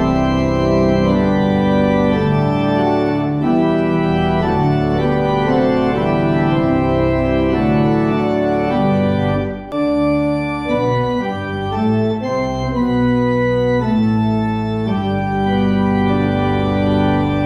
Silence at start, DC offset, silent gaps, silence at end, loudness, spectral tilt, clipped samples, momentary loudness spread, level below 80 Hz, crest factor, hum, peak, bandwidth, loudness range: 0 s; under 0.1%; none; 0 s; -16 LUFS; -8.5 dB/octave; under 0.1%; 4 LU; -34 dBFS; 12 dB; none; -2 dBFS; 9.8 kHz; 3 LU